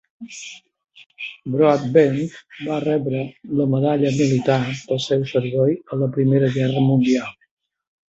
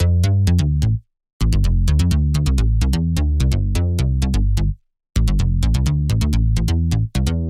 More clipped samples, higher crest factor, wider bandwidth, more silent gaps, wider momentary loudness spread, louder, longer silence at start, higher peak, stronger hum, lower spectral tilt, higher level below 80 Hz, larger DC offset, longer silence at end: neither; first, 18 dB vs 12 dB; second, 8 kHz vs 14.5 kHz; about the same, 1.06-1.10 s vs 1.33-1.40 s; first, 16 LU vs 5 LU; about the same, -19 LUFS vs -19 LUFS; first, 0.2 s vs 0 s; about the same, -2 dBFS vs -4 dBFS; neither; about the same, -7 dB/octave vs -6.5 dB/octave; second, -58 dBFS vs -20 dBFS; neither; first, 0.75 s vs 0 s